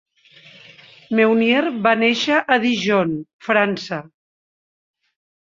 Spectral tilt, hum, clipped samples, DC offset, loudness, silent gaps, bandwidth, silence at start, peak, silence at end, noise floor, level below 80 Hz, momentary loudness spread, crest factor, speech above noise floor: -5 dB/octave; none; under 0.1%; under 0.1%; -18 LUFS; 3.33-3.39 s; 7.6 kHz; 1.1 s; -2 dBFS; 1.4 s; -48 dBFS; -66 dBFS; 11 LU; 18 dB; 31 dB